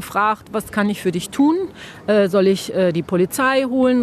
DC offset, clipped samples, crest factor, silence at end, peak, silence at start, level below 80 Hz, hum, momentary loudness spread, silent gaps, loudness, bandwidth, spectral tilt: under 0.1%; under 0.1%; 14 dB; 0 s; -4 dBFS; 0 s; -54 dBFS; none; 7 LU; none; -18 LUFS; 14 kHz; -5.5 dB/octave